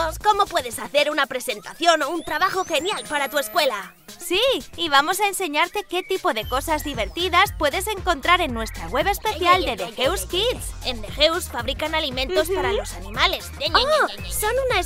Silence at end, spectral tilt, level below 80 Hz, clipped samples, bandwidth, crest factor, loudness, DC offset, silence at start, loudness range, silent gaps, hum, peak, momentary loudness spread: 0 s; -2.5 dB/octave; -38 dBFS; under 0.1%; 16 kHz; 20 dB; -21 LUFS; under 0.1%; 0 s; 2 LU; none; none; -2 dBFS; 8 LU